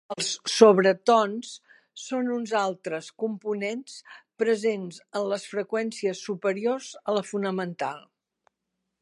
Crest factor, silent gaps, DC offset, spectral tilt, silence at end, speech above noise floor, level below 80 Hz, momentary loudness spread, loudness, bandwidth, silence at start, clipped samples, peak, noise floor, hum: 26 dB; none; under 0.1%; -4 dB/octave; 1 s; 56 dB; -82 dBFS; 15 LU; -26 LUFS; 11.5 kHz; 0.1 s; under 0.1%; -2 dBFS; -82 dBFS; none